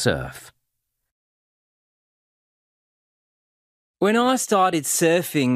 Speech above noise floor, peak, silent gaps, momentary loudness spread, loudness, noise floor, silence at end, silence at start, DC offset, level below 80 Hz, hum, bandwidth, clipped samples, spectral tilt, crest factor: 58 dB; -6 dBFS; 1.11-3.94 s; 7 LU; -20 LUFS; -78 dBFS; 0 s; 0 s; under 0.1%; -54 dBFS; none; 15.5 kHz; under 0.1%; -4 dB/octave; 20 dB